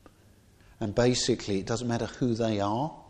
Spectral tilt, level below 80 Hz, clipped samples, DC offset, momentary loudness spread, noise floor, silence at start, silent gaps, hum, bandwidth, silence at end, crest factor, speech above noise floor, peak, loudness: -5 dB/octave; -52 dBFS; under 0.1%; under 0.1%; 7 LU; -58 dBFS; 0.8 s; none; none; 10.5 kHz; 0.05 s; 18 dB; 30 dB; -12 dBFS; -28 LUFS